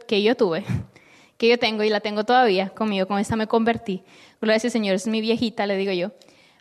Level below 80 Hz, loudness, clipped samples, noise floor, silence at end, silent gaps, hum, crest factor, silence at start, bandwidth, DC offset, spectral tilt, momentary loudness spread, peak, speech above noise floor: -58 dBFS; -22 LUFS; under 0.1%; -53 dBFS; 0.5 s; none; none; 16 dB; 0 s; 12.5 kHz; under 0.1%; -5 dB/octave; 9 LU; -6 dBFS; 31 dB